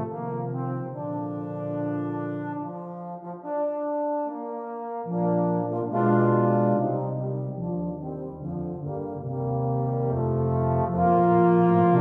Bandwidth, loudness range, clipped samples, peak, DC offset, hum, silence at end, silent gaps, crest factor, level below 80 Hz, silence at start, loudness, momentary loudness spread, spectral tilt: 3.4 kHz; 7 LU; under 0.1%; -8 dBFS; under 0.1%; none; 0 s; none; 16 dB; -54 dBFS; 0 s; -26 LUFS; 14 LU; -12 dB/octave